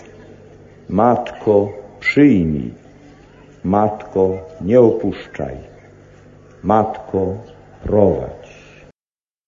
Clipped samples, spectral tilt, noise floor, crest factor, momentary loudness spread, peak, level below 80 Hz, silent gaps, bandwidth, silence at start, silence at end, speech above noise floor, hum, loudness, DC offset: under 0.1%; -8.5 dB/octave; under -90 dBFS; 18 dB; 16 LU; 0 dBFS; -40 dBFS; none; 7.6 kHz; 0.05 s; 1 s; over 74 dB; none; -17 LUFS; under 0.1%